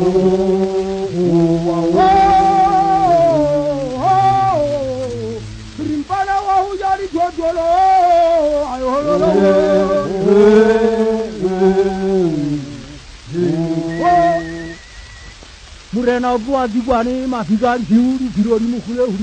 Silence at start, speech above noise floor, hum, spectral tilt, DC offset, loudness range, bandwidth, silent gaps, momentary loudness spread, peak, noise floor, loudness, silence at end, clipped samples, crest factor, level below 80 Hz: 0 s; 22 dB; none; -7 dB/octave; under 0.1%; 6 LU; 9.2 kHz; none; 11 LU; 0 dBFS; -37 dBFS; -15 LUFS; 0 s; under 0.1%; 14 dB; -38 dBFS